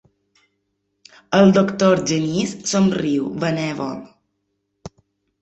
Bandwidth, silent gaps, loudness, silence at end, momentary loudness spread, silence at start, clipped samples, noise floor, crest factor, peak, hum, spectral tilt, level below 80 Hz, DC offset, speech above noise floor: 8.2 kHz; none; -18 LUFS; 0.55 s; 11 LU; 1.3 s; under 0.1%; -73 dBFS; 18 dB; -2 dBFS; none; -5.5 dB/octave; -54 dBFS; under 0.1%; 55 dB